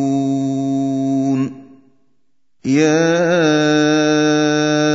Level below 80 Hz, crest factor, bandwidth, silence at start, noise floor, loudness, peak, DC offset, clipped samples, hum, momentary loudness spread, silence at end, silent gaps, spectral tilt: -64 dBFS; 14 dB; 7.8 kHz; 0 s; -70 dBFS; -15 LUFS; -2 dBFS; 0.2%; under 0.1%; none; 5 LU; 0 s; none; -5 dB/octave